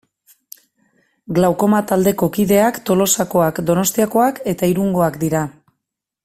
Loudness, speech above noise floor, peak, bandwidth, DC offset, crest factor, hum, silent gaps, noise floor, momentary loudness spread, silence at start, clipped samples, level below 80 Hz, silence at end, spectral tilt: -16 LUFS; 63 dB; -2 dBFS; 16 kHz; under 0.1%; 16 dB; none; none; -79 dBFS; 5 LU; 1.3 s; under 0.1%; -50 dBFS; 0.75 s; -5 dB/octave